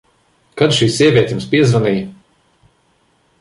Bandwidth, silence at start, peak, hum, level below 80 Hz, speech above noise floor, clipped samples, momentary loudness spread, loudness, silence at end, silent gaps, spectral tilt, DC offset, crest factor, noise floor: 11.5 kHz; 0.55 s; -2 dBFS; none; -48 dBFS; 45 dB; under 0.1%; 12 LU; -14 LUFS; 1.3 s; none; -5.5 dB/octave; under 0.1%; 16 dB; -58 dBFS